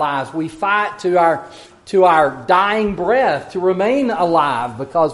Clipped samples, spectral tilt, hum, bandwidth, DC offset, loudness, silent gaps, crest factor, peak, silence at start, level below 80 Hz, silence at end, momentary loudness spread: under 0.1%; -6 dB/octave; none; 11.5 kHz; under 0.1%; -16 LUFS; none; 16 dB; 0 dBFS; 0 s; -50 dBFS; 0 s; 8 LU